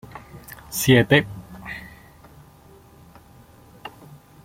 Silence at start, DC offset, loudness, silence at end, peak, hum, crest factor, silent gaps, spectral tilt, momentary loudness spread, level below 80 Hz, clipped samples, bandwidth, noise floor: 0.15 s; under 0.1%; -18 LUFS; 0.55 s; -2 dBFS; none; 24 dB; none; -5 dB/octave; 26 LU; -52 dBFS; under 0.1%; 16.5 kHz; -49 dBFS